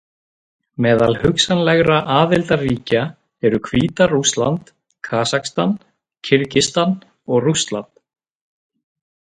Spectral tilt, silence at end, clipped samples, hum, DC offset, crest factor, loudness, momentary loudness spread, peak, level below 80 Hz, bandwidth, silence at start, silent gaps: -4.5 dB/octave; 1.4 s; under 0.1%; none; under 0.1%; 18 dB; -17 LUFS; 12 LU; 0 dBFS; -46 dBFS; 11 kHz; 0.8 s; none